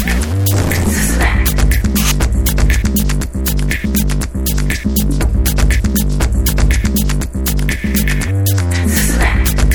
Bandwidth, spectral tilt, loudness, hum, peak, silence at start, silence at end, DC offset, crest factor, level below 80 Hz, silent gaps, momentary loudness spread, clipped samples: over 20 kHz; -4.5 dB/octave; -15 LUFS; none; 0 dBFS; 0 s; 0 s; under 0.1%; 12 dB; -16 dBFS; none; 4 LU; under 0.1%